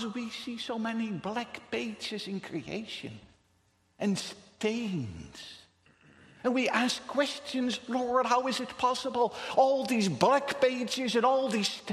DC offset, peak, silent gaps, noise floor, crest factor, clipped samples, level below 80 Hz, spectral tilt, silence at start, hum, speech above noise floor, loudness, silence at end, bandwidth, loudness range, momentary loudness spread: under 0.1%; -8 dBFS; none; -70 dBFS; 22 dB; under 0.1%; -68 dBFS; -4 dB/octave; 0 s; none; 39 dB; -30 LUFS; 0 s; 13.5 kHz; 9 LU; 12 LU